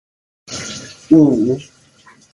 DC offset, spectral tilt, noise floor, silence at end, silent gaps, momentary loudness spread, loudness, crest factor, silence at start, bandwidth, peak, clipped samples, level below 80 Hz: under 0.1%; -6 dB/octave; -48 dBFS; 0.7 s; none; 18 LU; -15 LUFS; 18 dB; 0.5 s; 11.5 kHz; 0 dBFS; under 0.1%; -52 dBFS